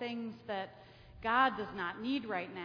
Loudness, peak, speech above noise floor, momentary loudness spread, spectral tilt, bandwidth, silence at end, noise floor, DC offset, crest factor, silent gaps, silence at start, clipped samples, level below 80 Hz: -36 LUFS; -16 dBFS; 21 dB; 11 LU; -6.5 dB/octave; 5.4 kHz; 0 s; -56 dBFS; under 0.1%; 22 dB; none; 0 s; under 0.1%; -64 dBFS